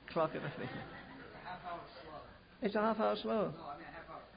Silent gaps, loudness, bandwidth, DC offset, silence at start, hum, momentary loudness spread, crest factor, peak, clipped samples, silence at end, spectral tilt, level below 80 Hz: none; -39 LUFS; 5 kHz; under 0.1%; 0 s; none; 17 LU; 18 dB; -22 dBFS; under 0.1%; 0 s; -4.5 dB/octave; -66 dBFS